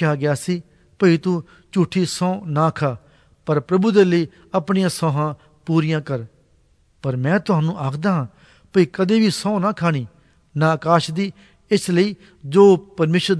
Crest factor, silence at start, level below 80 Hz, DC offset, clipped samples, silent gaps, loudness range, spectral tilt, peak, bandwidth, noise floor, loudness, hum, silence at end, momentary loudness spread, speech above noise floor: 18 dB; 0 s; -58 dBFS; under 0.1%; under 0.1%; none; 4 LU; -6.5 dB/octave; -2 dBFS; 11 kHz; -57 dBFS; -19 LUFS; none; 0 s; 11 LU; 39 dB